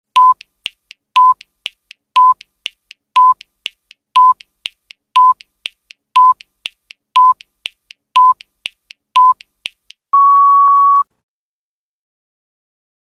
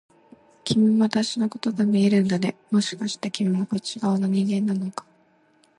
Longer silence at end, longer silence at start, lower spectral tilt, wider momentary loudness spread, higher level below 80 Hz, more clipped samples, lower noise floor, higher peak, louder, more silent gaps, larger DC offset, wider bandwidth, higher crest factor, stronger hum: first, 2.15 s vs 0.8 s; second, 0.15 s vs 0.65 s; second, 1.5 dB/octave vs -6 dB/octave; first, 20 LU vs 9 LU; second, -72 dBFS vs -66 dBFS; neither; first, under -90 dBFS vs -61 dBFS; first, 0 dBFS vs -6 dBFS; first, -11 LUFS vs -23 LUFS; neither; neither; about the same, 11 kHz vs 11.5 kHz; about the same, 14 dB vs 18 dB; neither